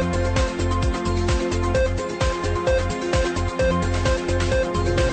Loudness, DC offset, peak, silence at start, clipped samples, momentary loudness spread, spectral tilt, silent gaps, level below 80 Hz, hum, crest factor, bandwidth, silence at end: -22 LUFS; under 0.1%; -10 dBFS; 0 s; under 0.1%; 2 LU; -5.5 dB/octave; none; -28 dBFS; none; 12 dB; 9 kHz; 0 s